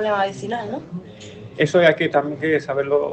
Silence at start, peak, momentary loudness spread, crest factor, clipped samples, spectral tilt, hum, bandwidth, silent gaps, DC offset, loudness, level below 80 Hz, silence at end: 0 s; 0 dBFS; 20 LU; 20 dB; under 0.1%; -6 dB/octave; none; 8.8 kHz; none; under 0.1%; -20 LUFS; -60 dBFS; 0 s